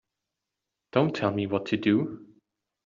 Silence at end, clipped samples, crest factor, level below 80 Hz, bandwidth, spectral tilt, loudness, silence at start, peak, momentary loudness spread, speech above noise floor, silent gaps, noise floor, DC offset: 0.6 s; under 0.1%; 22 dB; -68 dBFS; 7.4 kHz; -5.5 dB/octave; -27 LUFS; 0.95 s; -6 dBFS; 8 LU; 60 dB; none; -86 dBFS; under 0.1%